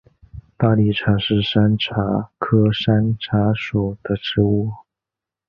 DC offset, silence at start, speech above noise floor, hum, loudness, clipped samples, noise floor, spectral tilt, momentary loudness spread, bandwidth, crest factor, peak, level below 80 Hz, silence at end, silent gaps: under 0.1%; 0.35 s; 69 dB; none; -19 LUFS; under 0.1%; -87 dBFS; -9 dB/octave; 6 LU; 5.8 kHz; 16 dB; -2 dBFS; -42 dBFS; 0.7 s; none